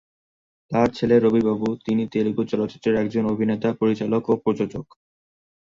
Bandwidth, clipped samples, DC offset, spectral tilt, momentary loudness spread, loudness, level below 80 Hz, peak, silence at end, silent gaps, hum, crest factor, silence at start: 7.4 kHz; under 0.1%; under 0.1%; -8 dB/octave; 7 LU; -22 LUFS; -54 dBFS; -4 dBFS; 0.85 s; none; none; 18 dB; 0.7 s